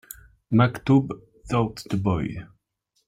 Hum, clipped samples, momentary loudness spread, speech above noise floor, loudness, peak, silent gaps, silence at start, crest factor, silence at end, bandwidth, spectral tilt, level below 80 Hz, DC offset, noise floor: none; under 0.1%; 19 LU; 51 dB; -24 LUFS; -6 dBFS; none; 0.5 s; 18 dB; 0.6 s; 16 kHz; -7.5 dB/octave; -50 dBFS; under 0.1%; -73 dBFS